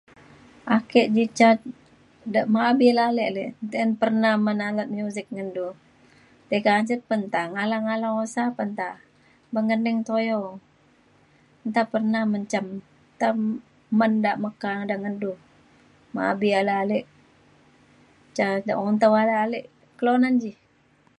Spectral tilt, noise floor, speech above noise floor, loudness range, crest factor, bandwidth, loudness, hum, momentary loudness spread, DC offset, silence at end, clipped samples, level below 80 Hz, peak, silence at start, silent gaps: -6 dB/octave; -61 dBFS; 38 dB; 6 LU; 20 dB; 10.5 kHz; -23 LUFS; none; 14 LU; under 0.1%; 0.7 s; under 0.1%; -70 dBFS; -4 dBFS; 0.65 s; none